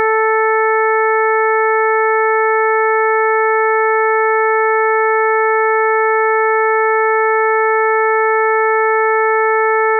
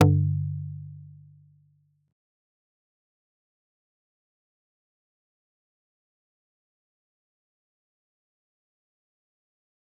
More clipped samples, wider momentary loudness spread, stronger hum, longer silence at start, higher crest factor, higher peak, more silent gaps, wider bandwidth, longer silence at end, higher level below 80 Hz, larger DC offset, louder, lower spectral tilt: neither; second, 0 LU vs 24 LU; neither; about the same, 0 s vs 0 s; second, 8 dB vs 32 dB; second, -6 dBFS vs -2 dBFS; neither; first, 2.4 kHz vs 0.7 kHz; second, 0 s vs 8.9 s; second, under -90 dBFS vs -68 dBFS; neither; first, -13 LUFS vs -27 LUFS; second, -1.5 dB/octave vs -8.5 dB/octave